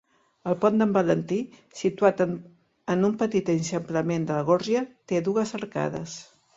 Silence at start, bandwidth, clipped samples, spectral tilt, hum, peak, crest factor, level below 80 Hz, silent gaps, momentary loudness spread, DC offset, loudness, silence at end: 0.45 s; 7.8 kHz; under 0.1%; -6.5 dB/octave; none; -6 dBFS; 20 dB; -64 dBFS; none; 13 LU; under 0.1%; -25 LUFS; 0.35 s